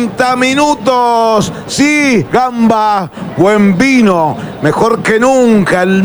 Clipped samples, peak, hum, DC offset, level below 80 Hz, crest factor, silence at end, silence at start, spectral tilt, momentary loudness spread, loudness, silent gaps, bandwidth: under 0.1%; 0 dBFS; none; under 0.1%; -44 dBFS; 10 dB; 0 s; 0 s; -5 dB/octave; 6 LU; -10 LUFS; none; over 20 kHz